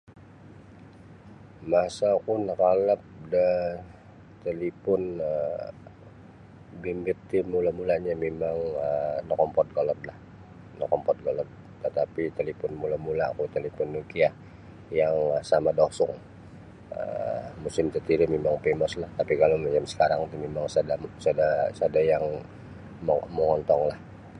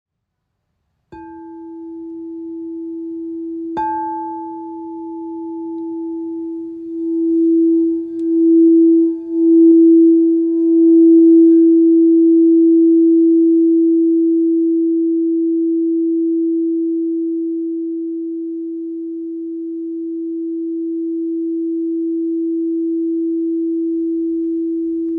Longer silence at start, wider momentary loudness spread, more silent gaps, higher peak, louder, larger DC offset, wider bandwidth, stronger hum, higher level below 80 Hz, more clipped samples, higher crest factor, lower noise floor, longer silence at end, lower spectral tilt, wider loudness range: second, 0.1 s vs 1.1 s; second, 14 LU vs 18 LU; neither; second, -8 dBFS vs -4 dBFS; second, -27 LUFS vs -15 LUFS; neither; first, 10.5 kHz vs 1.7 kHz; neither; first, -54 dBFS vs -64 dBFS; neither; first, 20 dB vs 12 dB; second, -49 dBFS vs -74 dBFS; about the same, 0 s vs 0 s; second, -6.5 dB/octave vs -10.5 dB/octave; second, 5 LU vs 15 LU